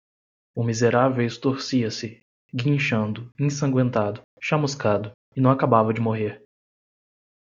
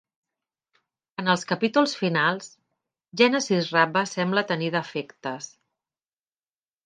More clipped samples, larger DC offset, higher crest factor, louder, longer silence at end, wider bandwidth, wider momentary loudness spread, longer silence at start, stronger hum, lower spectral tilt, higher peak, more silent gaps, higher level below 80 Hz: neither; neither; about the same, 22 dB vs 22 dB; about the same, -23 LUFS vs -24 LUFS; second, 1.15 s vs 1.35 s; second, 7.6 kHz vs 9.8 kHz; second, 11 LU vs 15 LU; second, 0.55 s vs 1.2 s; neither; first, -6.5 dB/octave vs -4.5 dB/octave; about the same, -2 dBFS vs -4 dBFS; first, 2.22-2.49 s, 4.24-4.37 s, 5.14-5.32 s vs none; first, -62 dBFS vs -76 dBFS